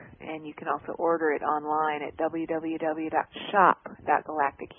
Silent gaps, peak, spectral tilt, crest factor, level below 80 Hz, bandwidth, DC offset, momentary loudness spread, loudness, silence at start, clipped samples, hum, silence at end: none; -6 dBFS; -9 dB/octave; 22 dB; -64 dBFS; 3.7 kHz; under 0.1%; 10 LU; -27 LUFS; 0 s; under 0.1%; none; 0.05 s